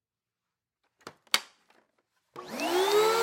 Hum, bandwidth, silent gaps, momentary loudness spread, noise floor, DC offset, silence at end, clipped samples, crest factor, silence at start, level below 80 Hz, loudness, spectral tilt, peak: none; 16.5 kHz; none; 22 LU; -90 dBFS; under 0.1%; 0 s; under 0.1%; 26 dB; 1.05 s; -80 dBFS; -27 LUFS; -1.5 dB/octave; -6 dBFS